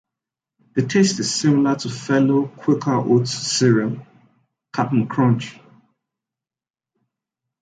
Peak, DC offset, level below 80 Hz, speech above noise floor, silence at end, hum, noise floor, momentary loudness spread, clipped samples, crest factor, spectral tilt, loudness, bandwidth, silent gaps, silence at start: -4 dBFS; under 0.1%; -62 dBFS; over 72 dB; 2.1 s; none; under -90 dBFS; 9 LU; under 0.1%; 16 dB; -5.5 dB/octave; -19 LUFS; 9.6 kHz; none; 0.75 s